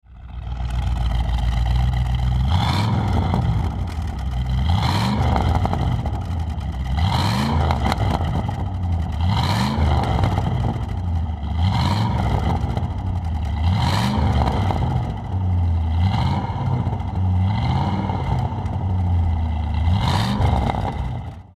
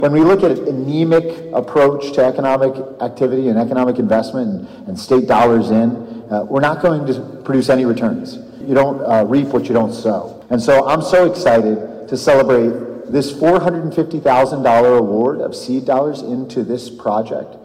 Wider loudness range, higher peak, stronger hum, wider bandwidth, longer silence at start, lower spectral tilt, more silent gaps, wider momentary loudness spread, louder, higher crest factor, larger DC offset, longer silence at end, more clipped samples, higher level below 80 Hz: about the same, 1 LU vs 2 LU; about the same, -4 dBFS vs -4 dBFS; neither; about the same, 13 kHz vs 14 kHz; about the same, 0.1 s vs 0 s; about the same, -7 dB/octave vs -7 dB/octave; neither; second, 6 LU vs 11 LU; second, -22 LUFS vs -15 LUFS; first, 16 dB vs 10 dB; neither; about the same, 0.15 s vs 0.05 s; neither; first, -26 dBFS vs -50 dBFS